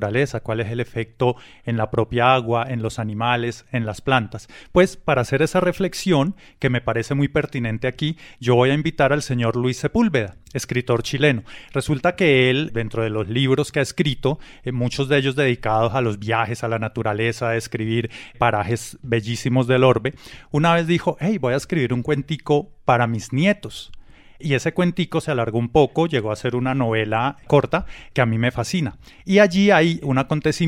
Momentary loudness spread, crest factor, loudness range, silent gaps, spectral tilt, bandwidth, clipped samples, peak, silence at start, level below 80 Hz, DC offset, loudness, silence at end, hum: 9 LU; 18 dB; 2 LU; none; -6 dB/octave; 15.5 kHz; under 0.1%; -2 dBFS; 0 s; -46 dBFS; under 0.1%; -21 LUFS; 0 s; none